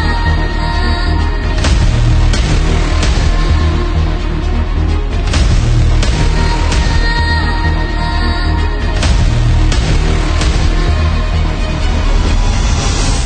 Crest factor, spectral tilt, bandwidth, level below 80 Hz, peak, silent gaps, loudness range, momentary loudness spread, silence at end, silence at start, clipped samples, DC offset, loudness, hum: 10 dB; -5 dB/octave; 9.4 kHz; -12 dBFS; 0 dBFS; none; 1 LU; 4 LU; 0 s; 0 s; under 0.1%; under 0.1%; -14 LUFS; none